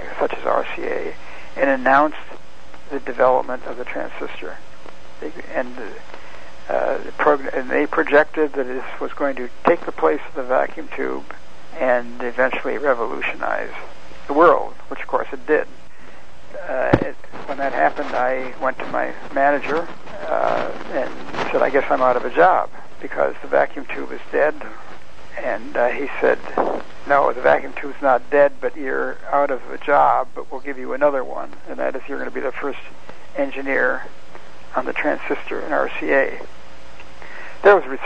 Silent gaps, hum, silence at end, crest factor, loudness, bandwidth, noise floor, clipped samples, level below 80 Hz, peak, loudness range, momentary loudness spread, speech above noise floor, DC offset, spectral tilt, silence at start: none; none; 0 s; 22 dB; -20 LUFS; 9.2 kHz; -44 dBFS; under 0.1%; -50 dBFS; 0 dBFS; 5 LU; 19 LU; 24 dB; 5%; -6 dB/octave; 0 s